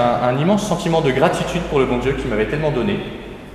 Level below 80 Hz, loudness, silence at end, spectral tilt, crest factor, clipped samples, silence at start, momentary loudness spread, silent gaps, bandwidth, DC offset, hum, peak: -36 dBFS; -18 LUFS; 0 s; -6 dB/octave; 18 dB; under 0.1%; 0 s; 6 LU; none; 14.5 kHz; under 0.1%; none; 0 dBFS